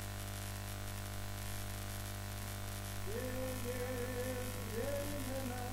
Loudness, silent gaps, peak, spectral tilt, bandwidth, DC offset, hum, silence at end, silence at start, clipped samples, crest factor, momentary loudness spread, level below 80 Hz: -42 LUFS; none; -26 dBFS; -4.5 dB/octave; 16 kHz; under 0.1%; 50 Hz at -45 dBFS; 0 s; 0 s; under 0.1%; 14 dB; 4 LU; -50 dBFS